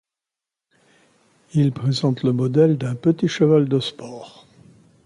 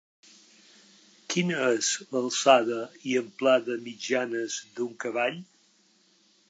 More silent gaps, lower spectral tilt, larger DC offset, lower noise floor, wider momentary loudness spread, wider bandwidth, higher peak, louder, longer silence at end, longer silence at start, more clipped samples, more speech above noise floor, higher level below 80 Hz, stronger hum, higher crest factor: neither; first, -7.5 dB/octave vs -3.5 dB/octave; neither; first, -87 dBFS vs -64 dBFS; about the same, 13 LU vs 13 LU; first, 11 kHz vs 9.2 kHz; about the same, -4 dBFS vs -4 dBFS; first, -19 LUFS vs -27 LUFS; second, 0.75 s vs 1.05 s; first, 1.55 s vs 1.3 s; neither; first, 68 dB vs 37 dB; first, -62 dBFS vs -84 dBFS; neither; second, 16 dB vs 24 dB